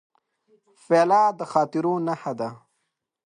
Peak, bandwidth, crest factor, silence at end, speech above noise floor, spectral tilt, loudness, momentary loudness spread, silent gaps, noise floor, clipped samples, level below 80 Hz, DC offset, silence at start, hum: -4 dBFS; 10.5 kHz; 20 dB; 0.7 s; 56 dB; -6.5 dB/octave; -23 LUFS; 12 LU; none; -78 dBFS; under 0.1%; -76 dBFS; under 0.1%; 0.9 s; none